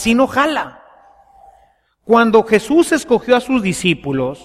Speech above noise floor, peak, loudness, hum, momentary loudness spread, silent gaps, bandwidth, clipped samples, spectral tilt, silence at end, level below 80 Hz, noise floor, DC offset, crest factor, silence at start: 41 dB; 0 dBFS; -15 LUFS; none; 7 LU; none; 15 kHz; under 0.1%; -5 dB/octave; 0.1 s; -46 dBFS; -55 dBFS; under 0.1%; 14 dB; 0 s